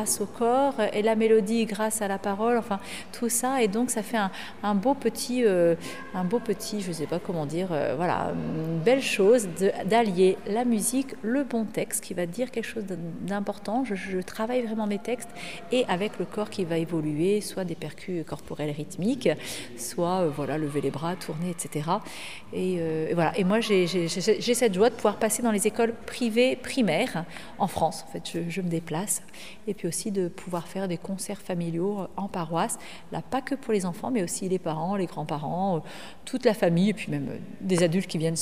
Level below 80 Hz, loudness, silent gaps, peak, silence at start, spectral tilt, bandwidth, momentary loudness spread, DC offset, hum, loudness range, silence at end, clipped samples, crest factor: -60 dBFS; -27 LUFS; none; -8 dBFS; 0 s; -5 dB/octave; 15.5 kHz; 10 LU; 0.7%; none; 6 LU; 0 s; under 0.1%; 20 dB